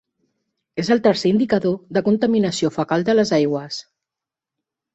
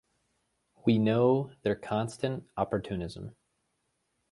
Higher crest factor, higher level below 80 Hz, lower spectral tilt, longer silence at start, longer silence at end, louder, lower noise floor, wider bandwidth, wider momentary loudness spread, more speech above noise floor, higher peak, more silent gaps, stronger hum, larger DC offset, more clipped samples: about the same, 16 dB vs 20 dB; about the same, -60 dBFS vs -58 dBFS; second, -6 dB/octave vs -7.5 dB/octave; about the same, 0.75 s vs 0.85 s; first, 1.15 s vs 1 s; first, -19 LUFS vs -30 LUFS; first, -87 dBFS vs -78 dBFS; second, 8.2 kHz vs 11.5 kHz; second, 10 LU vs 13 LU; first, 69 dB vs 49 dB; first, -4 dBFS vs -12 dBFS; neither; neither; neither; neither